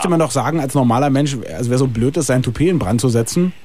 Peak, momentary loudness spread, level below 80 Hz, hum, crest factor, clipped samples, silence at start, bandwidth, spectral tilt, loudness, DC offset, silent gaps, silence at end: -4 dBFS; 3 LU; -40 dBFS; none; 12 dB; under 0.1%; 0 s; 15.5 kHz; -6 dB/octave; -17 LUFS; 2%; none; 0.15 s